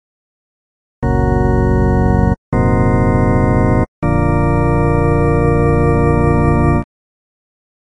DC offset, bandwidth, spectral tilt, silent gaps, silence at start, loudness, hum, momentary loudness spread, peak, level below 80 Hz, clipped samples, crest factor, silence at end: under 0.1%; 10 kHz; -10 dB/octave; 2.38-2.52 s, 3.88-4.02 s; 1 s; -14 LUFS; none; 3 LU; 0 dBFS; -22 dBFS; under 0.1%; 14 dB; 1 s